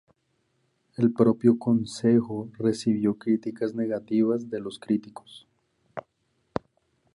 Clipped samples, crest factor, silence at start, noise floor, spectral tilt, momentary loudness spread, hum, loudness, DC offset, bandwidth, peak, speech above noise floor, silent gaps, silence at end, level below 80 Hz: under 0.1%; 20 dB; 1 s; -73 dBFS; -7.5 dB/octave; 20 LU; none; -26 LUFS; under 0.1%; 11 kHz; -6 dBFS; 48 dB; none; 1.15 s; -64 dBFS